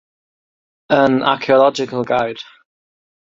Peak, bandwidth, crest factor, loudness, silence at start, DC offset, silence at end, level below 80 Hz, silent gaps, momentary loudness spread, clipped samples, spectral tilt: 0 dBFS; 7.6 kHz; 18 dB; -16 LUFS; 0.9 s; under 0.1%; 0.9 s; -58 dBFS; none; 10 LU; under 0.1%; -5.5 dB/octave